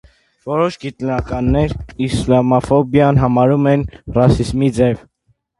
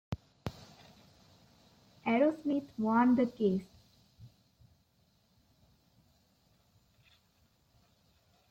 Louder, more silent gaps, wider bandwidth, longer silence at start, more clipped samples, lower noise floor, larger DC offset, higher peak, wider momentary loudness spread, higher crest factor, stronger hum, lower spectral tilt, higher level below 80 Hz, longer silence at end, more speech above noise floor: first, -15 LUFS vs -32 LUFS; neither; first, 11.5 kHz vs 8 kHz; first, 0.45 s vs 0.1 s; neither; second, -62 dBFS vs -71 dBFS; neither; first, 0 dBFS vs -16 dBFS; second, 9 LU vs 18 LU; about the same, 16 dB vs 20 dB; neither; about the same, -8 dB/octave vs -8 dB/octave; first, -32 dBFS vs -68 dBFS; second, 0.6 s vs 4.25 s; first, 48 dB vs 42 dB